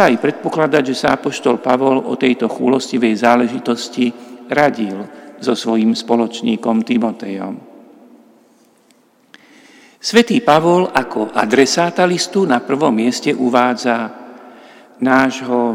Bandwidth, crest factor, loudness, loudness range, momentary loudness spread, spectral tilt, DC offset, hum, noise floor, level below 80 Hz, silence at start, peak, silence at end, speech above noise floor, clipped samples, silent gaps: 15 kHz; 16 dB; -15 LUFS; 7 LU; 10 LU; -4.5 dB/octave; under 0.1%; none; -53 dBFS; -60 dBFS; 0 s; 0 dBFS; 0 s; 38 dB; under 0.1%; none